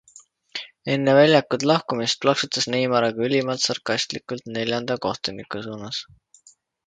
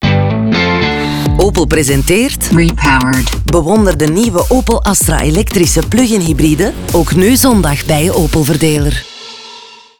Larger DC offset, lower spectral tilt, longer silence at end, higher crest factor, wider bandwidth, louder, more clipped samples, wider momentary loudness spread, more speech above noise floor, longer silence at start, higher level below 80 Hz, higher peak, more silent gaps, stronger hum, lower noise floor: second, under 0.1% vs 0.7%; about the same, -4 dB/octave vs -5 dB/octave; first, 0.85 s vs 0.25 s; first, 22 dB vs 10 dB; second, 9.4 kHz vs over 20 kHz; second, -22 LUFS vs -11 LUFS; neither; first, 15 LU vs 4 LU; first, 34 dB vs 25 dB; first, 0.15 s vs 0 s; second, -64 dBFS vs -20 dBFS; about the same, -2 dBFS vs 0 dBFS; neither; neither; first, -56 dBFS vs -35 dBFS